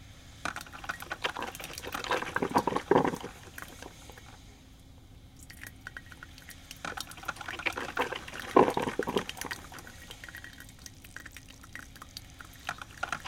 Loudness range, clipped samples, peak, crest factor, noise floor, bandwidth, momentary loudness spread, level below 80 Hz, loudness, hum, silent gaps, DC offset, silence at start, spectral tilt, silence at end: 14 LU; under 0.1%; -6 dBFS; 30 dB; -53 dBFS; 17 kHz; 22 LU; -56 dBFS; -33 LUFS; none; none; under 0.1%; 0 s; -4 dB/octave; 0 s